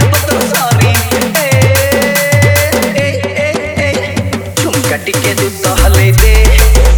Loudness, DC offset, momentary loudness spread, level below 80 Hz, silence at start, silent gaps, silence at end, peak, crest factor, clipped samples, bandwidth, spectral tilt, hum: -10 LUFS; under 0.1%; 7 LU; -14 dBFS; 0 s; none; 0 s; 0 dBFS; 8 dB; 0.4%; over 20 kHz; -4.5 dB/octave; none